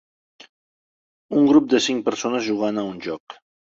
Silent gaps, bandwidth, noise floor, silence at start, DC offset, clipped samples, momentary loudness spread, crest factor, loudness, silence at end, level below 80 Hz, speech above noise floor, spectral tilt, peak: 3.20-3.27 s; 8 kHz; under -90 dBFS; 1.3 s; under 0.1%; under 0.1%; 15 LU; 18 dB; -20 LUFS; 0.45 s; -64 dBFS; over 70 dB; -4.5 dB/octave; -4 dBFS